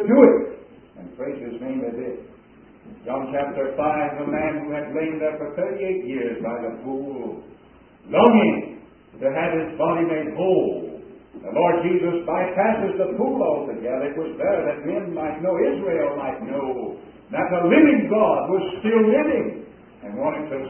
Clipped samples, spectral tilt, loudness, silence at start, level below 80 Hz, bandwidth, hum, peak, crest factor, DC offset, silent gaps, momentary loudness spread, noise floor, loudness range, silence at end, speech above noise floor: under 0.1%; -10.5 dB/octave; -22 LUFS; 0 s; -58 dBFS; 3.3 kHz; none; 0 dBFS; 22 dB; under 0.1%; none; 16 LU; -49 dBFS; 7 LU; 0 s; 28 dB